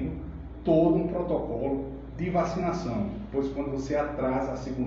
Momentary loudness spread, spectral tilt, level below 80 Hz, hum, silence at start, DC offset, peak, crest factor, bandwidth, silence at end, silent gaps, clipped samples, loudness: 11 LU; -8 dB/octave; -42 dBFS; none; 0 s; under 0.1%; -10 dBFS; 18 dB; 7.6 kHz; 0 s; none; under 0.1%; -29 LUFS